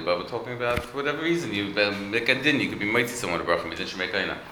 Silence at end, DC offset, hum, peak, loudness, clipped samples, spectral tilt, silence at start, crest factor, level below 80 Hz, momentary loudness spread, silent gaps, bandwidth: 0 s; under 0.1%; none; -6 dBFS; -25 LUFS; under 0.1%; -4 dB/octave; 0 s; 20 dB; -52 dBFS; 7 LU; none; over 20 kHz